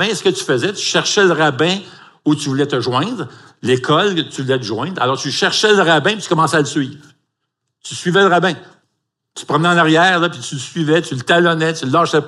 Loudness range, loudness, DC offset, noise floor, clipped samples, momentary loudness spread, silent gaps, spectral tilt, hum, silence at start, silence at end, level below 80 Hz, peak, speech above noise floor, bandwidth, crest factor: 3 LU; -15 LUFS; under 0.1%; -75 dBFS; under 0.1%; 11 LU; none; -4 dB/octave; none; 0 s; 0 s; -68 dBFS; 0 dBFS; 59 dB; 12 kHz; 16 dB